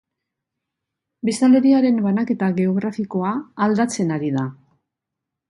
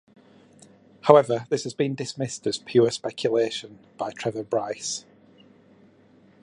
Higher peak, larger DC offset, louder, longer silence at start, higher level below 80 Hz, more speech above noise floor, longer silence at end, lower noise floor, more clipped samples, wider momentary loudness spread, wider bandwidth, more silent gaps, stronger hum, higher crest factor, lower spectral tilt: second, -6 dBFS vs 0 dBFS; neither; first, -19 LUFS vs -24 LUFS; first, 1.25 s vs 1.05 s; about the same, -66 dBFS vs -70 dBFS; first, 65 dB vs 32 dB; second, 0.95 s vs 1.45 s; first, -83 dBFS vs -56 dBFS; neither; second, 10 LU vs 16 LU; about the same, 11.5 kHz vs 11 kHz; neither; neither; second, 14 dB vs 26 dB; first, -6.5 dB/octave vs -5 dB/octave